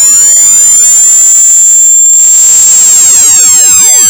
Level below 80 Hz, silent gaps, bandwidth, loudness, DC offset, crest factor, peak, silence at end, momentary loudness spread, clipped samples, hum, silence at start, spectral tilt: -44 dBFS; none; over 20 kHz; 1 LUFS; under 0.1%; 2 dB; 0 dBFS; 0 s; 0 LU; 30%; none; 0 s; 2.5 dB/octave